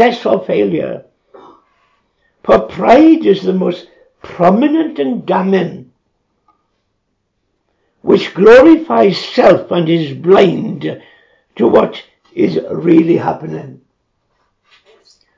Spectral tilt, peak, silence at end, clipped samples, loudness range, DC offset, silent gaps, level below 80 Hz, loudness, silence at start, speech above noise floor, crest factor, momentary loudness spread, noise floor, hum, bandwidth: -7.5 dB/octave; 0 dBFS; 1.65 s; 0.6%; 7 LU; under 0.1%; none; -50 dBFS; -11 LUFS; 0 s; 56 dB; 12 dB; 17 LU; -67 dBFS; none; 7.6 kHz